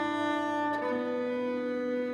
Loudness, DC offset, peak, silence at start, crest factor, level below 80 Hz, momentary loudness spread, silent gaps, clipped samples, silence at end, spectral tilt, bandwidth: -31 LUFS; under 0.1%; -20 dBFS; 0 s; 10 dB; -72 dBFS; 2 LU; none; under 0.1%; 0 s; -5.5 dB/octave; 10 kHz